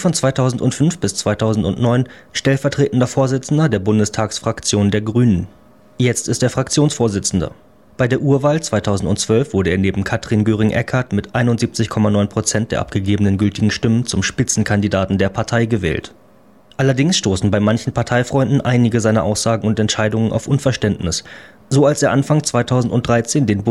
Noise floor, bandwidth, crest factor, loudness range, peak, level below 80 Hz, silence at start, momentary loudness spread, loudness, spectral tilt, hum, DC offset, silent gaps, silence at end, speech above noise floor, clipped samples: -49 dBFS; 12.5 kHz; 14 dB; 1 LU; -2 dBFS; -42 dBFS; 0 s; 4 LU; -17 LUFS; -5.5 dB/octave; none; 0.2%; none; 0 s; 33 dB; under 0.1%